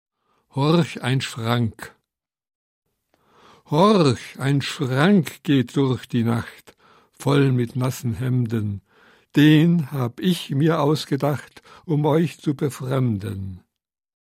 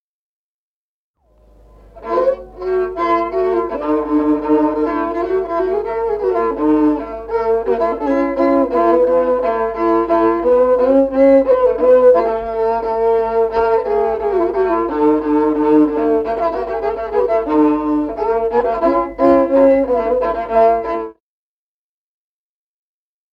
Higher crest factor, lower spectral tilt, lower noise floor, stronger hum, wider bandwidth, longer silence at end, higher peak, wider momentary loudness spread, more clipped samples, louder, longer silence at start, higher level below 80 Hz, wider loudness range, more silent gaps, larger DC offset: about the same, 18 dB vs 14 dB; about the same, -7 dB/octave vs -8 dB/octave; second, -81 dBFS vs under -90 dBFS; neither; first, 16 kHz vs 5.8 kHz; second, 0.65 s vs 2.2 s; about the same, -4 dBFS vs -2 dBFS; first, 11 LU vs 7 LU; neither; second, -21 LUFS vs -15 LUFS; second, 0.55 s vs 1.95 s; second, -62 dBFS vs -42 dBFS; about the same, 4 LU vs 6 LU; first, 2.55-2.82 s vs none; neither